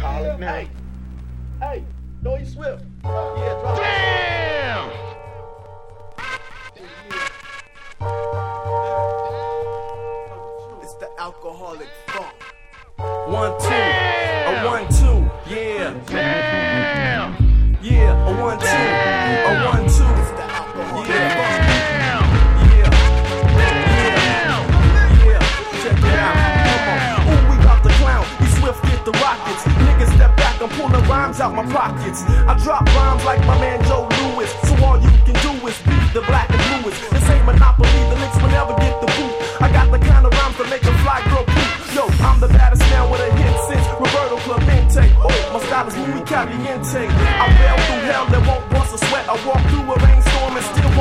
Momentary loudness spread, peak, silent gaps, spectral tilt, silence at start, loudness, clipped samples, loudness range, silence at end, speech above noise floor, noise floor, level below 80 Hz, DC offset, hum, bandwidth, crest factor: 17 LU; 0 dBFS; none; -5.5 dB/octave; 0 s; -16 LUFS; under 0.1%; 12 LU; 0 s; 26 dB; -41 dBFS; -18 dBFS; under 0.1%; none; 12.5 kHz; 14 dB